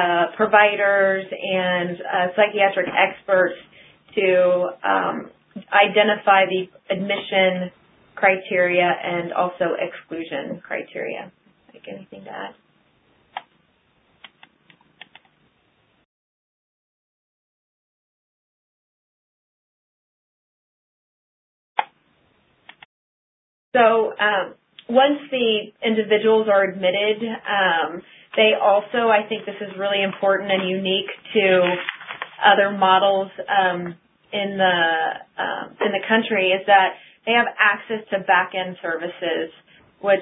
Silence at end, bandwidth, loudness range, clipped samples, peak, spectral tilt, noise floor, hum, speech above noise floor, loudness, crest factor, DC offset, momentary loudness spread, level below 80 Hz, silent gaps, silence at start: 0 s; 4 kHz; 17 LU; under 0.1%; 0 dBFS; -9 dB/octave; -63 dBFS; none; 43 dB; -20 LUFS; 22 dB; under 0.1%; 14 LU; -72 dBFS; 16.05-21.76 s, 22.85-23.72 s; 0 s